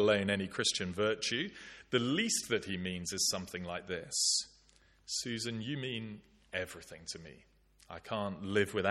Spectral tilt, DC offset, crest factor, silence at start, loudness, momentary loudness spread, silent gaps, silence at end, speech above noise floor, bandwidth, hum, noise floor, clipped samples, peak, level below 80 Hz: -3 dB/octave; under 0.1%; 22 dB; 0 s; -35 LUFS; 16 LU; none; 0 s; 31 dB; 14 kHz; none; -66 dBFS; under 0.1%; -14 dBFS; -68 dBFS